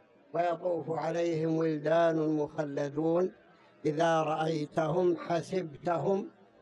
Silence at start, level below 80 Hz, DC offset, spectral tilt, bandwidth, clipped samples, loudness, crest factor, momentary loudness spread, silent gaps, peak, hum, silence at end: 0.35 s; -74 dBFS; under 0.1%; -7 dB/octave; 11 kHz; under 0.1%; -31 LUFS; 14 dB; 7 LU; none; -16 dBFS; none; 0.35 s